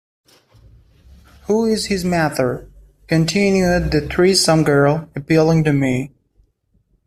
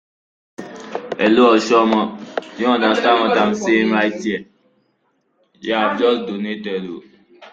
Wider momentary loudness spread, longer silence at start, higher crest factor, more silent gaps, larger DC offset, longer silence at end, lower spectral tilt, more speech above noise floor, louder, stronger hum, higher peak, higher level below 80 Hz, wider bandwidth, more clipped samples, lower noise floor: second, 9 LU vs 17 LU; first, 1.5 s vs 0.6 s; about the same, 16 dB vs 16 dB; neither; neither; first, 1 s vs 0.05 s; about the same, -5.5 dB/octave vs -5 dB/octave; about the same, 46 dB vs 49 dB; about the same, -16 LUFS vs -17 LUFS; neither; about the same, -2 dBFS vs -2 dBFS; first, -38 dBFS vs -62 dBFS; first, 14.5 kHz vs 7.8 kHz; neither; about the same, -62 dBFS vs -65 dBFS